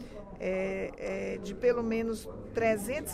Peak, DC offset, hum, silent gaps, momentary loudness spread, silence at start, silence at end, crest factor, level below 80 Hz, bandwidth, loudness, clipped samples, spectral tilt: -14 dBFS; under 0.1%; none; none; 9 LU; 0 s; 0 s; 18 dB; -52 dBFS; 16 kHz; -32 LUFS; under 0.1%; -5.5 dB/octave